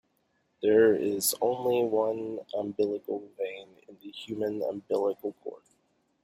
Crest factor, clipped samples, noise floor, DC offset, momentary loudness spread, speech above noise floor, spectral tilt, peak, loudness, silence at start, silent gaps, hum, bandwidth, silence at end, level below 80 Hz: 18 dB; under 0.1%; -73 dBFS; under 0.1%; 20 LU; 45 dB; -4 dB/octave; -10 dBFS; -29 LUFS; 0.6 s; none; none; 16 kHz; 0.65 s; -74 dBFS